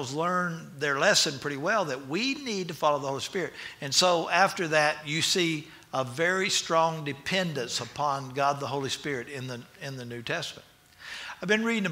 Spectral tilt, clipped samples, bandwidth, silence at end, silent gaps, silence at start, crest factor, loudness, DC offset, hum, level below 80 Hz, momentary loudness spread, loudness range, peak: -3 dB/octave; under 0.1%; 16 kHz; 0 s; none; 0 s; 20 dB; -27 LUFS; under 0.1%; none; -68 dBFS; 14 LU; 7 LU; -8 dBFS